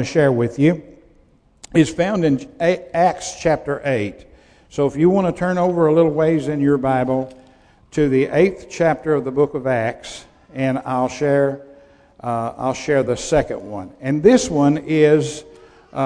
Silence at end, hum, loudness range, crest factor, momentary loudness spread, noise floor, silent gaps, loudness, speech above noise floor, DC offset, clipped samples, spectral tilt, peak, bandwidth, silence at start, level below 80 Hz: 0 s; none; 4 LU; 18 dB; 13 LU; -54 dBFS; none; -18 LUFS; 36 dB; under 0.1%; under 0.1%; -6.5 dB/octave; 0 dBFS; 10.5 kHz; 0 s; -46 dBFS